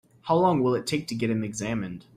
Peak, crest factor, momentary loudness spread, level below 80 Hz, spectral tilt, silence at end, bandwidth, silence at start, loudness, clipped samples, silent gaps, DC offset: -10 dBFS; 16 dB; 8 LU; -58 dBFS; -6 dB/octave; 0.15 s; 15 kHz; 0.25 s; -26 LUFS; under 0.1%; none; under 0.1%